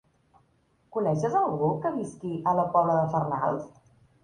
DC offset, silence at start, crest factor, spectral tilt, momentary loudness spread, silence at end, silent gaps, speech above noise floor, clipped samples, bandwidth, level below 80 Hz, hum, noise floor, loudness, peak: under 0.1%; 0.9 s; 18 dB; -8.5 dB/octave; 11 LU; 0.55 s; none; 41 dB; under 0.1%; 10 kHz; -64 dBFS; none; -67 dBFS; -27 LUFS; -10 dBFS